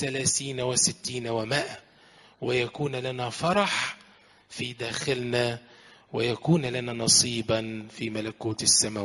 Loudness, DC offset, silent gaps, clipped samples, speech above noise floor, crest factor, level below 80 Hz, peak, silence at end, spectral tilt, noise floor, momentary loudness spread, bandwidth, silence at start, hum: -26 LUFS; under 0.1%; none; under 0.1%; 29 dB; 24 dB; -60 dBFS; -4 dBFS; 0 s; -3 dB/octave; -57 dBFS; 15 LU; 11.5 kHz; 0 s; none